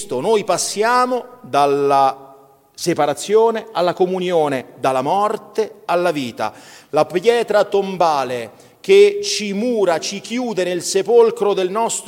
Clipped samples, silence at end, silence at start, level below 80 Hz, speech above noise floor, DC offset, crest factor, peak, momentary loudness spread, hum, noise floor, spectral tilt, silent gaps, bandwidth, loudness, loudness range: under 0.1%; 0 s; 0 s; -66 dBFS; 30 dB; under 0.1%; 16 dB; -2 dBFS; 9 LU; none; -47 dBFS; -4 dB/octave; none; 16.5 kHz; -17 LUFS; 3 LU